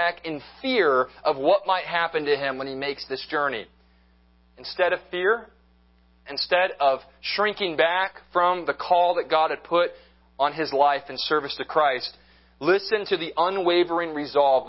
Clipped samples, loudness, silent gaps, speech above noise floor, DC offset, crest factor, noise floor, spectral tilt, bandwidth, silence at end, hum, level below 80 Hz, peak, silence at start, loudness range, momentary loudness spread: under 0.1%; -24 LUFS; none; 35 dB; under 0.1%; 20 dB; -59 dBFS; -7.5 dB/octave; 5.8 kHz; 0 s; none; -62 dBFS; -4 dBFS; 0 s; 5 LU; 8 LU